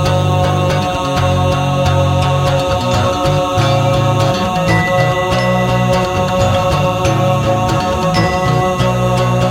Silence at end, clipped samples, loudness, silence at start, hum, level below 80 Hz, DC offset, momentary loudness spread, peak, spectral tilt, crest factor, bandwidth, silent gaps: 0 s; under 0.1%; -14 LUFS; 0 s; none; -30 dBFS; under 0.1%; 2 LU; -2 dBFS; -6 dB/octave; 12 dB; 16.5 kHz; none